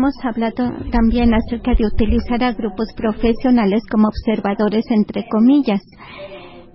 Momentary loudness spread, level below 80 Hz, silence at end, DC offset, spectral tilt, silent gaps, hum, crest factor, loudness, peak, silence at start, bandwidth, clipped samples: 9 LU; -28 dBFS; 0.15 s; under 0.1%; -11.5 dB/octave; none; none; 14 dB; -17 LUFS; -2 dBFS; 0 s; 5.8 kHz; under 0.1%